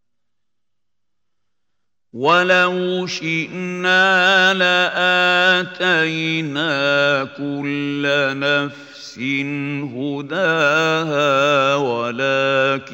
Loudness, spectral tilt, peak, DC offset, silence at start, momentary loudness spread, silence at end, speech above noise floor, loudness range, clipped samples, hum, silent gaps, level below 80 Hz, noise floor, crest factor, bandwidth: -17 LUFS; -4.5 dB/octave; -2 dBFS; under 0.1%; 2.15 s; 11 LU; 0 s; 65 dB; 5 LU; under 0.1%; none; none; -70 dBFS; -83 dBFS; 18 dB; 16 kHz